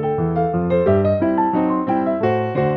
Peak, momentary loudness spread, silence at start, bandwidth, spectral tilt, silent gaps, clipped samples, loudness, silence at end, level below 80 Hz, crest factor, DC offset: -4 dBFS; 3 LU; 0 s; 5.4 kHz; -11 dB/octave; none; under 0.1%; -18 LUFS; 0 s; -46 dBFS; 14 dB; under 0.1%